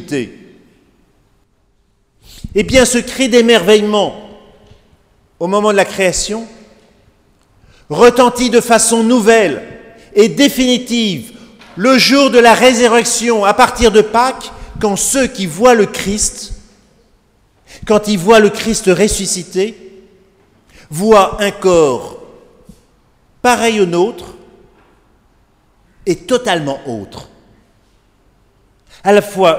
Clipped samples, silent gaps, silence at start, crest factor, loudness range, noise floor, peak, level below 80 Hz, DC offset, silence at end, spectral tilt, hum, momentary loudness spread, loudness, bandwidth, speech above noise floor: 0.3%; none; 0 s; 14 dB; 8 LU; -57 dBFS; 0 dBFS; -38 dBFS; under 0.1%; 0 s; -3.5 dB/octave; none; 17 LU; -11 LUFS; 16.5 kHz; 46 dB